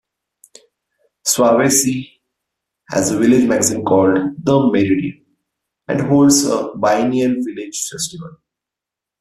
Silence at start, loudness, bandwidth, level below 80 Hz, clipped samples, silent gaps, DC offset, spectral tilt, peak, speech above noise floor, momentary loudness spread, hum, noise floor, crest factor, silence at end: 1.25 s; -15 LUFS; 14.5 kHz; -54 dBFS; under 0.1%; none; under 0.1%; -4.5 dB/octave; -2 dBFS; 70 dB; 12 LU; none; -85 dBFS; 16 dB; 0.85 s